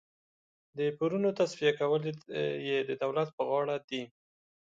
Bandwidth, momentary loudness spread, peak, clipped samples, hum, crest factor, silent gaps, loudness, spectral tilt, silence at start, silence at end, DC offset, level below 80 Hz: 7.8 kHz; 9 LU; -14 dBFS; under 0.1%; none; 18 dB; 3.33-3.38 s, 3.84-3.88 s; -32 LUFS; -6 dB/octave; 0.75 s; 0.65 s; under 0.1%; -78 dBFS